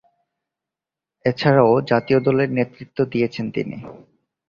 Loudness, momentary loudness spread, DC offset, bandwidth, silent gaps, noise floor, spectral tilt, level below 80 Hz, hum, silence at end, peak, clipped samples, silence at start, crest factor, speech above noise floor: -19 LUFS; 12 LU; under 0.1%; 7.2 kHz; none; -88 dBFS; -8.5 dB/octave; -58 dBFS; none; 0.55 s; -2 dBFS; under 0.1%; 1.25 s; 18 dB; 69 dB